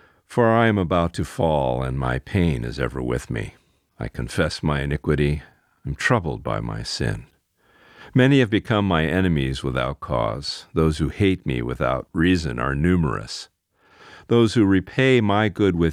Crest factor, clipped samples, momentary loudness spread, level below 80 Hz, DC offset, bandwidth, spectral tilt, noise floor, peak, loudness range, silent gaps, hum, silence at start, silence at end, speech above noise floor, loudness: 18 dB; under 0.1%; 11 LU; -38 dBFS; under 0.1%; 14 kHz; -6.5 dB/octave; -59 dBFS; -4 dBFS; 4 LU; none; none; 0.3 s; 0 s; 38 dB; -22 LUFS